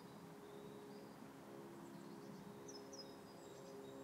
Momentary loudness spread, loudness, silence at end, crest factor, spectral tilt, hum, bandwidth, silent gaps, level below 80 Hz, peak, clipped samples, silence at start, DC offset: 3 LU; -56 LUFS; 0 s; 14 dB; -4.5 dB/octave; none; 16 kHz; none; -86 dBFS; -42 dBFS; under 0.1%; 0 s; under 0.1%